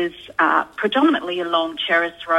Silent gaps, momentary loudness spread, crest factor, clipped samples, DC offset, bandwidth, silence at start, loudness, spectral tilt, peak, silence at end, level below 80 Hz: none; 4 LU; 16 dB; under 0.1%; under 0.1%; 12 kHz; 0 s; -19 LUFS; -4.5 dB/octave; -4 dBFS; 0 s; -60 dBFS